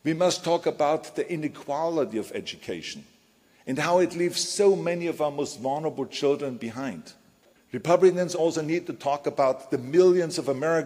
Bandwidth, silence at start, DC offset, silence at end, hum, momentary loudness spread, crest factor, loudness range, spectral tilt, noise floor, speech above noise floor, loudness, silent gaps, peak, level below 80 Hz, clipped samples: 15.5 kHz; 0.05 s; under 0.1%; 0 s; none; 14 LU; 20 dB; 5 LU; -5 dB/octave; -61 dBFS; 36 dB; -26 LUFS; none; -6 dBFS; -70 dBFS; under 0.1%